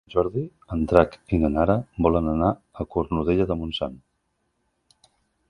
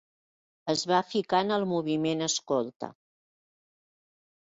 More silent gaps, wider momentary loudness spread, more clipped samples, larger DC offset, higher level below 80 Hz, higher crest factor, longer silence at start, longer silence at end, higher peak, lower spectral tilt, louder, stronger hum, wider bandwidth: second, none vs 2.76-2.80 s; about the same, 10 LU vs 12 LU; neither; neither; first, -38 dBFS vs -74 dBFS; about the same, 24 dB vs 20 dB; second, 0.15 s vs 0.65 s; about the same, 1.55 s vs 1.5 s; first, 0 dBFS vs -12 dBFS; first, -9 dB/octave vs -4 dB/octave; first, -24 LUFS vs -28 LUFS; neither; first, 10.5 kHz vs 8.2 kHz